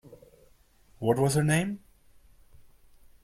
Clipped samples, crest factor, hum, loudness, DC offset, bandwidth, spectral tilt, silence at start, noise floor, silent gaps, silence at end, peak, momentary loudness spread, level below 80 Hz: under 0.1%; 20 dB; none; -27 LUFS; under 0.1%; 15.5 kHz; -5.5 dB/octave; 0.05 s; -60 dBFS; none; 1.45 s; -12 dBFS; 11 LU; -58 dBFS